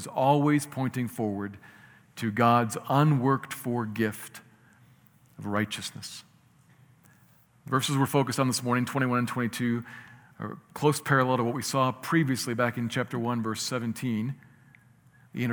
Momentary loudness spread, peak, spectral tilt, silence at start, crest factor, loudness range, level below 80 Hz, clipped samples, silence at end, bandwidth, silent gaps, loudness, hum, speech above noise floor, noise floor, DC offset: 16 LU; -8 dBFS; -5.5 dB/octave; 0 s; 20 dB; 7 LU; -72 dBFS; under 0.1%; 0 s; over 20 kHz; none; -27 LUFS; none; 33 dB; -60 dBFS; under 0.1%